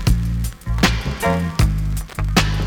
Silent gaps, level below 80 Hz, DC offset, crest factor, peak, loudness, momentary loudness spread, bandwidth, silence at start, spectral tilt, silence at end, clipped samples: none; -22 dBFS; under 0.1%; 16 dB; -2 dBFS; -20 LUFS; 7 LU; 19 kHz; 0 s; -5 dB/octave; 0 s; under 0.1%